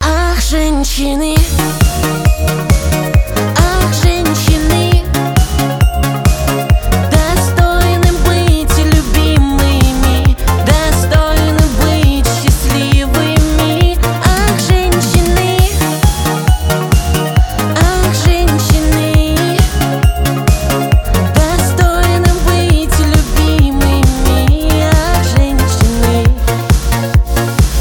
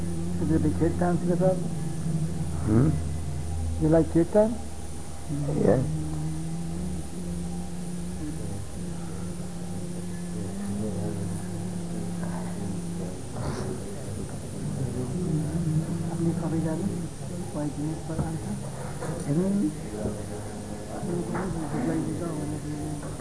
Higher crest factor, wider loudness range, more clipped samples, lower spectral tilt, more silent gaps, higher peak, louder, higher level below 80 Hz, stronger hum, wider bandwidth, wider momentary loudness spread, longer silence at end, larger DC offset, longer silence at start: second, 10 dB vs 20 dB; second, 1 LU vs 8 LU; neither; second, -5 dB/octave vs -7 dB/octave; neither; first, 0 dBFS vs -8 dBFS; first, -12 LUFS vs -29 LUFS; first, -14 dBFS vs -42 dBFS; neither; first, 19.5 kHz vs 11 kHz; second, 2 LU vs 12 LU; about the same, 0 s vs 0 s; second, under 0.1% vs 1%; about the same, 0 s vs 0 s